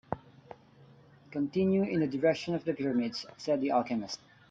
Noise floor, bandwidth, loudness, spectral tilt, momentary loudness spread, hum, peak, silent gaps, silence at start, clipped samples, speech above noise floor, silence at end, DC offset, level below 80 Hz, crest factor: -58 dBFS; 7.8 kHz; -31 LUFS; -6.5 dB/octave; 13 LU; none; -14 dBFS; none; 0.1 s; under 0.1%; 28 dB; 0.35 s; under 0.1%; -68 dBFS; 18 dB